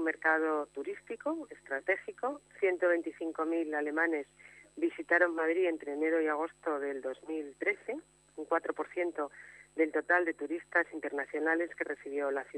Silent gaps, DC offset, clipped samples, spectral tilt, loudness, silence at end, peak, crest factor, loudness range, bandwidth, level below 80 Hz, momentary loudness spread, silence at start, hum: none; under 0.1%; under 0.1%; -4.5 dB/octave; -33 LUFS; 0 s; -14 dBFS; 20 dB; 4 LU; 10.5 kHz; -78 dBFS; 12 LU; 0 s; none